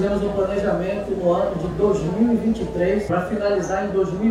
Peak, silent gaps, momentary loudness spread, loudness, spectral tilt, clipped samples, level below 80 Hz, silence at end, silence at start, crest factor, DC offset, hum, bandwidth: -8 dBFS; none; 3 LU; -21 LUFS; -7.5 dB/octave; under 0.1%; -40 dBFS; 0 s; 0 s; 12 dB; under 0.1%; none; 11.5 kHz